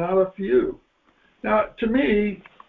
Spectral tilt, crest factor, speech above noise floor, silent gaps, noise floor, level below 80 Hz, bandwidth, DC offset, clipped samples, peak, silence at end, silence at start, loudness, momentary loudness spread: -9.5 dB/octave; 14 dB; 40 dB; none; -62 dBFS; -48 dBFS; 4.3 kHz; under 0.1%; under 0.1%; -8 dBFS; 0.3 s; 0 s; -22 LUFS; 9 LU